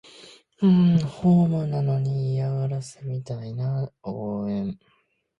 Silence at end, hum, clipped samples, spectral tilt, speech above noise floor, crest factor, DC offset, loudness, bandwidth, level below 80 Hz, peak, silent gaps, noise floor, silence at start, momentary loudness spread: 0.65 s; none; under 0.1%; -9 dB/octave; 27 dB; 14 dB; under 0.1%; -24 LUFS; 10 kHz; -58 dBFS; -10 dBFS; none; -50 dBFS; 0.2 s; 14 LU